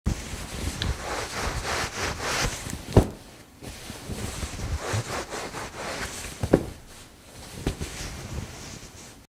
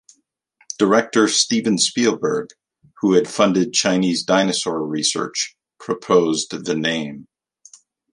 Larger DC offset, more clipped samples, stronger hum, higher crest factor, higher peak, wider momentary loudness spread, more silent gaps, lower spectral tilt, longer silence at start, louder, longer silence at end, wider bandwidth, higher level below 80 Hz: neither; neither; neither; first, 30 dB vs 20 dB; about the same, 0 dBFS vs 0 dBFS; first, 17 LU vs 11 LU; neither; about the same, -4.5 dB/octave vs -3.5 dB/octave; second, 0.05 s vs 0.8 s; second, -30 LUFS vs -19 LUFS; second, 0.05 s vs 0.9 s; first, 16.5 kHz vs 11.5 kHz; first, -38 dBFS vs -64 dBFS